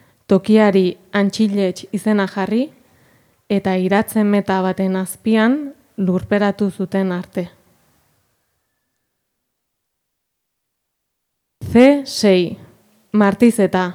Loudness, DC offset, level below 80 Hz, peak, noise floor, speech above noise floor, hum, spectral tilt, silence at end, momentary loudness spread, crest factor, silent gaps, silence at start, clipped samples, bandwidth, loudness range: -17 LUFS; under 0.1%; -54 dBFS; 0 dBFS; -75 dBFS; 60 dB; none; -6.5 dB/octave; 0 s; 10 LU; 18 dB; none; 0.3 s; under 0.1%; 15.5 kHz; 8 LU